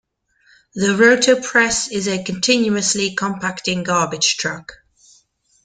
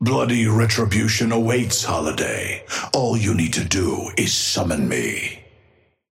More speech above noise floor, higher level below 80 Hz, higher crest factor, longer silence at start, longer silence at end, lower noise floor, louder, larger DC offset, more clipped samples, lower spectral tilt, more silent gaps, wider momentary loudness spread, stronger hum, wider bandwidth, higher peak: about the same, 40 dB vs 38 dB; second, -54 dBFS vs -46 dBFS; about the same, 18 dB vs 18 dB; first, 0.75 s vs 0 s; first, 0.9 s vs 0.7 s; about the same, -58 dBFS vs -58 dBFS; first, -17 LUFS vs -20 LUFS; neither; neither; second, -2.5 dB/octave vs -4 dB/octave; neither; first, 10 LU vs 7 LU; neither; second, 10 kHz vs 16.5 kHz; about the same, -2 dBFS vs -4 dBFS